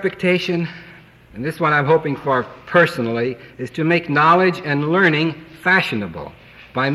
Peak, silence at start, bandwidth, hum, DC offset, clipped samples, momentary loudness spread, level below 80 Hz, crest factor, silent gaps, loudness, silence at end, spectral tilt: -2 dBFS; 0 s; 13.5 kHz; none; under 0.1%; under 0.1%; 14 LU; -54 dBFS; 16 dB; none; -18 LUFS; 0 s; -6.5 dB/octave